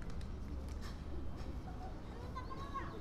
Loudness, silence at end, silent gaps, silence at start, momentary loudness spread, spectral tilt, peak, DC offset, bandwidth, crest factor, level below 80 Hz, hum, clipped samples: -47 LUFS; 0 s; none; 0 s; 3 LU; -6.5 dB/octave; -32 dBFS; under 0.1%; 13.5 kHz; 12 dB; -48 dBFS; none; under 0.1%